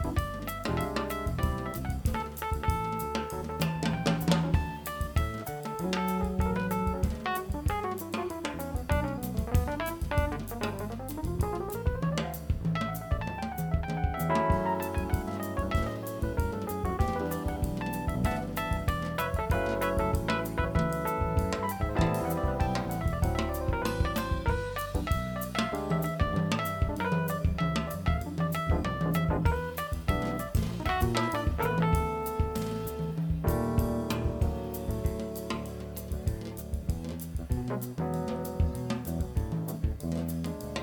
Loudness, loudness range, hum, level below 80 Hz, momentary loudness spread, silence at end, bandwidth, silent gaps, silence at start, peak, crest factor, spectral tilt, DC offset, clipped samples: -31 LUFS; 3 LU; none; -38 dBFS; 6 LU; 0 s; 19.5 kHz; none; 0 s; -10 dBFS; 20 dB; -6.5 dB/octave; under 0.1%; under 0.1%